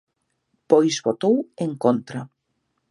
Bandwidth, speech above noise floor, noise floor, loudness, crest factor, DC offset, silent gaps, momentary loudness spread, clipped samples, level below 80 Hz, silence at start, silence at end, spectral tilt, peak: 11.5 kHz; 53 dB; -74 dBFS; -21 LUFS; 20 dB; under 0.1%; none; 12 LU; under 0.1%; -72 dBFS; 0.7 s; 0.65 s; -5.5 dB/octave; -2 dBFS